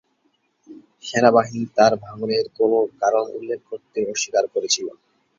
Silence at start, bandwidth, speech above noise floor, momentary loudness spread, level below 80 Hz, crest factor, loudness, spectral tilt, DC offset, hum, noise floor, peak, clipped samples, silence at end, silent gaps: 0.7 s; 7.8 kHz; 47 dB; 13 LU; -64 dBFS; 20 dB; -21 LUFS; -3.5 dB/octave; under 0.1%; none; -67 dBFS; -2 dBFS; under 0.1%; 0.5 s; none